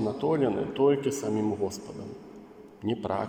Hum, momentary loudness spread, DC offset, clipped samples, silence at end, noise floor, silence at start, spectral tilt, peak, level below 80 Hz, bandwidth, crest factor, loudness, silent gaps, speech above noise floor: none; 19 LU; under 0.1%; under 0.1%; 0 s; -48 dBFS; 0 s; -6 dB/octave; -12 dBFS; -64 dBFS; 16.5 kHz; 16 dB; -28 LUFS; none; 20 dB